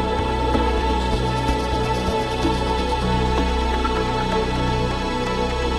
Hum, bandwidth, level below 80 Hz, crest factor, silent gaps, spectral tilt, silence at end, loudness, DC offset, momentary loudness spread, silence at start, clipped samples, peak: none; 12.5 kHz; -26 dBFS; 14 dB; none; -5.5 dB/octave; 0 s; -21 LUFS; under 0.1%; 2 LU; 0 s; under 0.1%; -6 dBFS